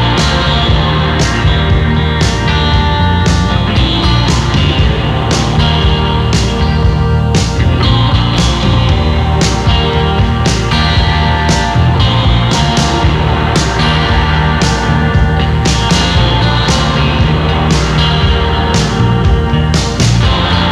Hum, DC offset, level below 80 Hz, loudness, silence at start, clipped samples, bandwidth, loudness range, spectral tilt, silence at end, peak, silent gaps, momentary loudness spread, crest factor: none; under 0.1%; -16 dBFS; -11 LUFS; 0 s; under 0.1%; 12 kHz; 0 LU; -5 dB/octave; 0 s; 0 dBFS; none; 2 LU; 10 dB